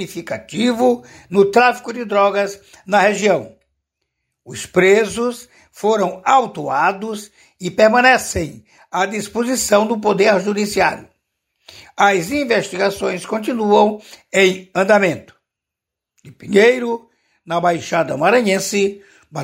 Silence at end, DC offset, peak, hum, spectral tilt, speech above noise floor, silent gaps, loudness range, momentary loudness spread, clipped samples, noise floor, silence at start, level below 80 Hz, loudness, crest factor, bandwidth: 0 s; under 0.1%; 0 dBFS; none; -4 dB/octave; 67 dB; none; 2 LU; 13 LU; under 0.1%; -84 dBFS; 0 s; -52 dBFS; -16 LUFS; 16 dB; 16 kHz